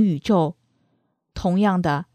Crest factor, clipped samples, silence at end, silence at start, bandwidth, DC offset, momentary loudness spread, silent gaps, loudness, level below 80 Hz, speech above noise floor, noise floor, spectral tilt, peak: 14 dB; under 0.1%; 0.1 s; 0 s; 9.4 kHz; under 0.1%; 8 LU; none; -21 LUFS; -46 dBFS; 49 dB; -69 dBFS; -7.5 dB/octave; -6 dBFS